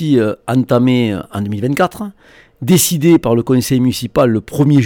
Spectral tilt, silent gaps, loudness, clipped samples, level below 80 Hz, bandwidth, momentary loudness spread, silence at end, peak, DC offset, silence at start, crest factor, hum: -6 dB/octave; none; -14 LUFS; under 0.1%; -44 dBFS; 19 kHz; 10 LU; 0 s; -2 dBFS; under 0.1%; 0 s; 12 dB; none